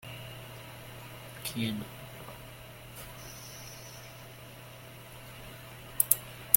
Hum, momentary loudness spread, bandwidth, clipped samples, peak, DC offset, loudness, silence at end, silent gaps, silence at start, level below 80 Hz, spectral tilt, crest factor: none; 19 LU; 17 kHz; under 0.1%; 0 dBFS; under 0.1%; -36 LUFS; 0 s; none; 0 s; -60 dBFS; -2.5 dB/octave; 38 dB